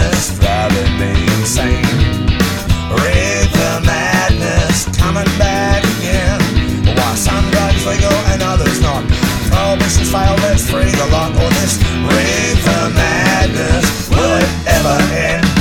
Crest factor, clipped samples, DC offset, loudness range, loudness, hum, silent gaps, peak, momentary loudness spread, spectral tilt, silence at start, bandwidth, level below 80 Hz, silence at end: 12 dB; under 0.1%; 0.2%; 1 LU; -13 LUFS; none; none; 0 dBFS; 2 LU; -4.5 dB/octave; 0 s; 17.5 kHz; -20 dBFS; 0 s